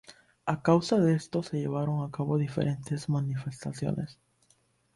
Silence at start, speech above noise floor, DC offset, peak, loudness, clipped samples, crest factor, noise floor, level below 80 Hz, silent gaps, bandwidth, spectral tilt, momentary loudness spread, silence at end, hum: 0.1 s; 40 dB; under 0.1%; -10 dBFS; -30 LUFS; under 0.1%; 20 dB; -68 dBFS; -62 dBFS; none; 11.5 kHz; -7.5 dB/octave; 10 LU; 0.85 s; none